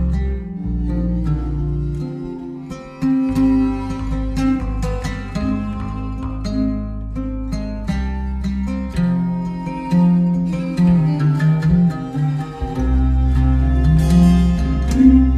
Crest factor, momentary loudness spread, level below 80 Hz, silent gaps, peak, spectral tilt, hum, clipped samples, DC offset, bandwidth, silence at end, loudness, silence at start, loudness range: 16 dB; 12 LU; -22 dBFS; none; 0 dBFS; -8.5 dB/octave; none; under 0.1%; under 0.1%; 10.5 kHz; 0 s; -19 LUFS; 0 s; 7 LU